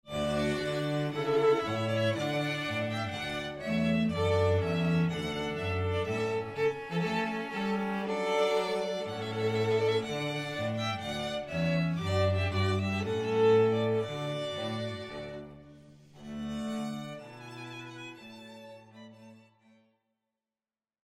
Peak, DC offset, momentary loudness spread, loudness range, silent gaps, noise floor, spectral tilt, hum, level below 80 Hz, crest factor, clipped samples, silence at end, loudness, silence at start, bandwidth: -16 dBFS; under 0.1%; 16 LU; 12 LU; none; under -90 dBFS; -6 dB/octave; none; -58 dBFS; 16 dB; under 0.1%; 1.7 s; -31 LUFS; 0.05 s; 14 kHz